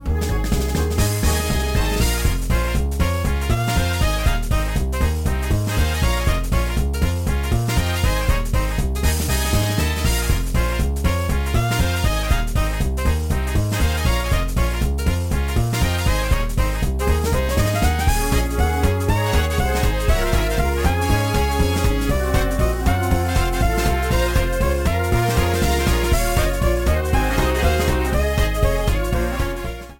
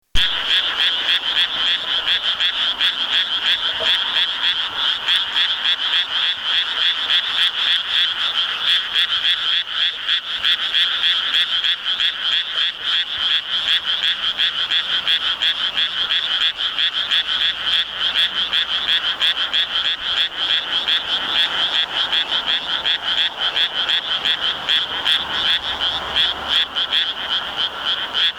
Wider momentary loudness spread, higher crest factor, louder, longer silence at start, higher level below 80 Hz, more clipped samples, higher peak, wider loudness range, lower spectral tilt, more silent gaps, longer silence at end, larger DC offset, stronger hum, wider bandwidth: about the same, 3 LU vs 3 LU; about the same, 12 dB vs 14 dB; second, -20 LUFS vs -17 LUFS; second, 0 s vs 0.15 s; first, -22 dBFS vs -46 dBFS; neither; about the same, -6 dBFS vs -6 dBFS; about the same, 2 LU vs 1 LU; first, -5 dB/octave vs 0 dB/octave; neither; about the same, 0.05 s vs 0 s; neither; neither; second, 17 kHz vs 19 kHz